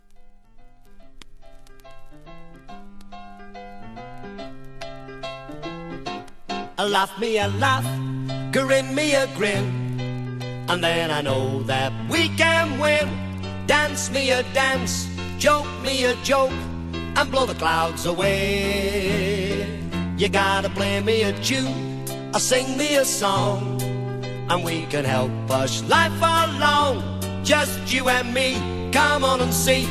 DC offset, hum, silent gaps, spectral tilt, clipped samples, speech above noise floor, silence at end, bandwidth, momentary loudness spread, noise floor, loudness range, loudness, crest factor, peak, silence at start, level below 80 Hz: under 0.1%; none; none; -4 dB/octave; under 0.1%; 23 dB; 0 s; 16 kHz; 15 LU; -44 dBFS; 13 LU; -22 LUFS; 20 dB; -4 dBFS; 0.1 s; -42 dBFS